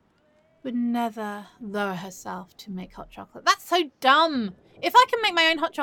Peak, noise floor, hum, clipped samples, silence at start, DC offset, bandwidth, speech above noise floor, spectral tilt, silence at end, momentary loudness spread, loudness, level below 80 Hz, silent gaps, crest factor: -4 dBFS; -63 dBFS; none; under 0.1%; 0.65 s; under 0.1%; 17.5 kHz; 39 dB; -3 dB/octave; 0 s; 19 LU; -22 LUFS; -62 dBFS; none; 20 dB